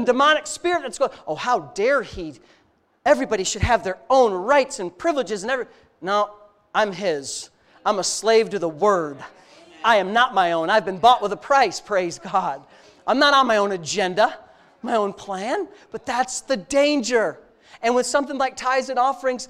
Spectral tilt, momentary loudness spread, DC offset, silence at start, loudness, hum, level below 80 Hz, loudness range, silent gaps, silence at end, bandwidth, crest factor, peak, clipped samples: -3 dB/octave; 11 LU; under 0.1%; 0 s; -21 LUFS; none; -48 dBFS; 4 LU; none; 0.05 s; 14 kHz; 18 dB; -2 dBFS; under 0.1%